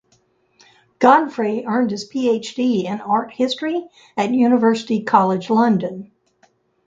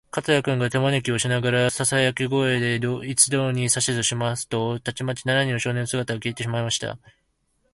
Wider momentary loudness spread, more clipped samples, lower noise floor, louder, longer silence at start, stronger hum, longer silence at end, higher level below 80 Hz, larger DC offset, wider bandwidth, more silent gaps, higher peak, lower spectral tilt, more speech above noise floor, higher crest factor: about the same, 9 LU vs 8 LU; neither; second, -61 dBFS vs -69 dBFS; first, -18 LUFS vs -22 LUFS; first, 1 s vs 0.15 s; neither; about the same, 0.8 s vs 0.75 s; second, -66 dBFS vs -56 dBFS; neither; second, 7.8 kHz vs 11.5 kHz; neither; about the same, 0 dBFS vs -2 dBFS; first, -6 dB/octave vs -4 dB/octave; about the same, 43 dB vs 46 dB; about the same, 18 dB vs 20 dB